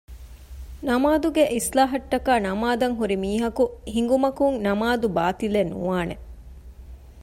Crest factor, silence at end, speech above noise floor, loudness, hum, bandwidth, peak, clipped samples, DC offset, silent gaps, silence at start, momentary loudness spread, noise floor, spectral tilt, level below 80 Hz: 16 dB; 0 s; 20 dB; -23 LUFS; none; 16 kHz; -8 dBFS; under 0.1%; under 0.1%; none; 0.1 s; 7 LU; -42 dBFS; -5 dB/octave; -42 dBFS